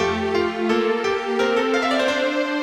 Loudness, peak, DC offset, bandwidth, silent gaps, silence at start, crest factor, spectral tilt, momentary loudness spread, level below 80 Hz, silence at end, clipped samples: -21 LUFS; -6 dBFS; under 0.1%; 14.5 kHz; none; 0 s; 14 dB; -4 dB/octave; 3 LU; -54 dBFS; 0 s; under 0.1%